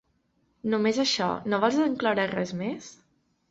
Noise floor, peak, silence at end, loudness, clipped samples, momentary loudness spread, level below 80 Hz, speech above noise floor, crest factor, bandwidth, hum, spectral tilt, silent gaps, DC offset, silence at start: -70 dBFS; -8 dBFS; 0.6 s; -26 LUFS; under 0.1%; 10 LU; -66 dBFS; 44 dB; 20 dB; 7.8 kHz; none; -4.5 dB/octave; none; under 0.1%; 0.65 s